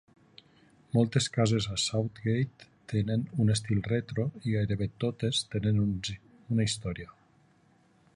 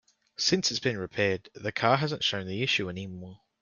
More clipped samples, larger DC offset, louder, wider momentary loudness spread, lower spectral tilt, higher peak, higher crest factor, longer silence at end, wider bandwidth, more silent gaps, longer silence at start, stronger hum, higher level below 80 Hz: neither; neither; about the same, -30 LUFS vs -28 LUFS; second, 8 LU vs 15 LU; first, -5.5 dB/octave vs -3.5 dB/octave; second, -12 dBFS vs -8 dBFS; about the same, 20 dB vs 22 dB; first, 1.1 s vs 0.25 s; about the same, 11 kHz vs 10 kHz; neither; first, 0.95 s vs 0.4 s; neither; first, -54 dBFS vs -64 dBFS